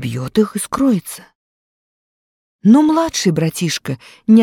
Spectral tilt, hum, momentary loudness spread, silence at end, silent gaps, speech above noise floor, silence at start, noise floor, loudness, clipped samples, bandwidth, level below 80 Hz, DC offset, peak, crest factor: -5.5 dB/octave; none; 13 LU; 0 s; 1.35-2.59 s; over 75 dB; 0 s; under -90 dBFS; -16 LUFS; under 0.1%; 16.5 kHz; -52 dBFS; under 0.1%; -2 dBFS; 14 dB